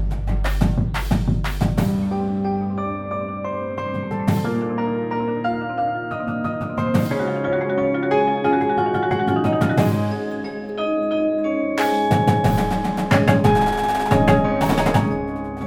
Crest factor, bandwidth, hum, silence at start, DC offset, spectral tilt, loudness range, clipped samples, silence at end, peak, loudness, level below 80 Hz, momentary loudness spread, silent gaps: 18 dB; 19 kHz; none; 0 s; under 0.1%; -7 dB/octave; 6 LU; under 0.1%; 0 s; -2 dBFS; -21 LUFS; -32 dBFS; 9 LU; none